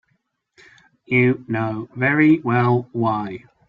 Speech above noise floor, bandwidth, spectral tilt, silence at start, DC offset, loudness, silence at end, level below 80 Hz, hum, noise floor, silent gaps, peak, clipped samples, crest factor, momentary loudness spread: 51 dB; 5.2 kHz; -9.5 dB/octave; 1.1 s; under 0.1%; -19 LUFS; 0.3 s; -58 dBFS; none; -69 dBFS; none; -4 dBFS; under 0.1%; 16 dB; 10 LU